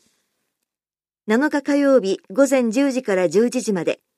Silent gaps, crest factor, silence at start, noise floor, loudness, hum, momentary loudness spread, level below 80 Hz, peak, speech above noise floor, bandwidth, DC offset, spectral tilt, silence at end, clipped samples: none; 16 dB; 1.25 s; under -90 dBFS; -19 LUFS; none; 6 LU; -74 dBFS; -4 dBFS; over 72 dB; 13.5 kHz; under 0.1%; -5 dB/octave; 0.25 s; under 0.1%